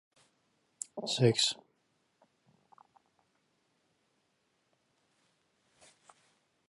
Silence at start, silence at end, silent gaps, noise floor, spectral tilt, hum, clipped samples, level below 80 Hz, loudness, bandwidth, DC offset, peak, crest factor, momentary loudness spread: 0.95 s; 5.15 s; none; -77 dBFS; -4 dB/octave; none; under 0.1%; -78 dBFS; -30 LUFS; 11.5 kHz; under 0.1%; -12 dBFS; 28 dB; 18 LU